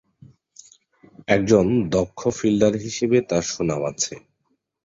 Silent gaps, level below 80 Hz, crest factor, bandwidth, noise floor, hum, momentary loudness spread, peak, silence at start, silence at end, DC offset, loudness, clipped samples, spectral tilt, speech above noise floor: none; -50 dBFS; 20 dB; 7.8 kHz; -72 dBFS; none; 9 LU; -2 dBFS; 1.3 s; 0.7 s; under 0.1%; -21 LUFS; under 0.1%; -5 dB/octave; 51 dB